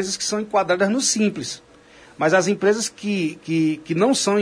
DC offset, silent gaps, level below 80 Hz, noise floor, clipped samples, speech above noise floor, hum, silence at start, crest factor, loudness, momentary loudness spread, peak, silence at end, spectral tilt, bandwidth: under 0.1%; none; -62 dBFS; -48 dBFS; under 0.1%; 28 dB; none; 0 s; 16 dB; -20 LUFS; 6 LU; -4 dBFS; 0 s; -3.5 dB/octave; 10.5 kHz